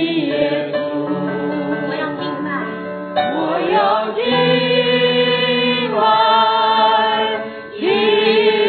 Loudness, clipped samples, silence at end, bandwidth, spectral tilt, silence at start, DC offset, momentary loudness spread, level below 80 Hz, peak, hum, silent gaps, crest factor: -16 LUFS; under 0.1%; 0 s; 4.6 kHz; -8 dB/octave; 0 s; under 0.1%; 9 LU; -62 dBFS; -2 dBFS; none; none; 14 dB